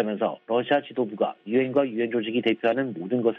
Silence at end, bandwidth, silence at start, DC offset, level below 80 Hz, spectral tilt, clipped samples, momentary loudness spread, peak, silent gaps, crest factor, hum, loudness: 0 s; 4.6 kHz; 0 s; under 0.1%; -74 dBFS; -8.5 dB/octave; under 0.1%; 4 LU; -8 dBFS; none; 16 dB; none; -25 LUFS